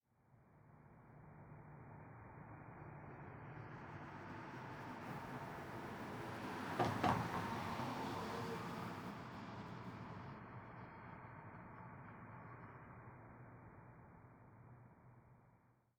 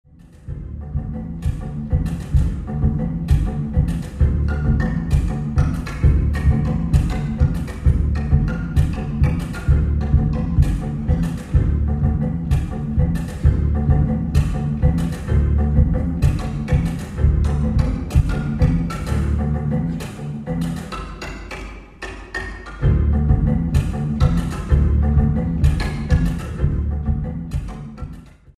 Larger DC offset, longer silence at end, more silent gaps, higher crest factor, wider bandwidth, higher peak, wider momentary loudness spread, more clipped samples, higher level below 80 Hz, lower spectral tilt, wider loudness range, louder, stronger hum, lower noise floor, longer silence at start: neither; about the same, 0.25 s vs 0.3 s; neither; first, 28 dB vs 16 dB; first, over 20 kHz vs 11 kHz; second, -22 dBFS vs -2 dBFS; first, 19 LU vs 11 LU; neither; second, -72 dBFS vs -22 dBFS; second, -6 dB/octave vs -8 dB/octave; first, 15 LU vs 4 LU; second, -48 LUFS vs -20 LUFS; neither; first, -73 dBFS vs -39 dBFS; about the same, 0.3 s vs 0.25 s